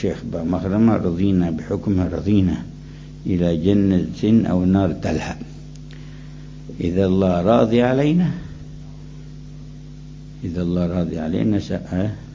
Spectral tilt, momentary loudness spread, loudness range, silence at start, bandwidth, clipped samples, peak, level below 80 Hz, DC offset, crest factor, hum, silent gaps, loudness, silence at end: -8.5 dB/octave; 21 LU; 5 LU; 0 s; 7.6 kHz; under 0.1%; -2 dBFS; -36 dBFS; under 0.1%; 18 dB; none; none; -19 LUFS; 0 s